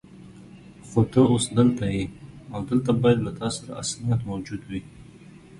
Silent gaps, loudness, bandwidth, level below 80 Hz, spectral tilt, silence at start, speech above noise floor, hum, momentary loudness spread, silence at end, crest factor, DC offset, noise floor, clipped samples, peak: none; -24 LUFS; 11.5 kHz; -50 dBFS; -6 dB/octave; 0.15 s; 24 dB; none; 15 LU; 0 s; 18 dB; under 0.1%; -47 dBFS; under 0.1%; -6 dBFS